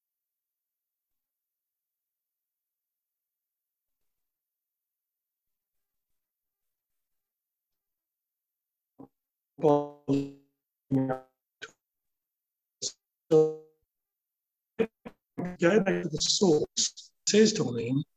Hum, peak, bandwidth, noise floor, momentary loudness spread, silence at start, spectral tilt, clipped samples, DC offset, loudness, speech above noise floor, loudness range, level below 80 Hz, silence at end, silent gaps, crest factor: none; -10 dBFS; 9 kHz; -89 dBFS; 18 LU; 9.6 s; -4 dB/octave; under 0.1%; under 0.1%; -27 LUFS; 63 dB; 8 LU; -68 dBFS; 0.15 s; none; 22 dB